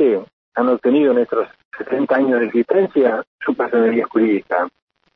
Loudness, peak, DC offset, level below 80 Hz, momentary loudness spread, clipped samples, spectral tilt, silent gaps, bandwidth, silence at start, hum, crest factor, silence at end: -18 LUFS; -2 dBFS; under 0.1%; -68 dBFS; 9 LU; under 0.1%; -9 dB/octave; 0.33-0.52 s, 1.65-1.71 s, 3.27-3.38 s; 5.2 kHz; 0 s; none; 16 dB; 0.45 s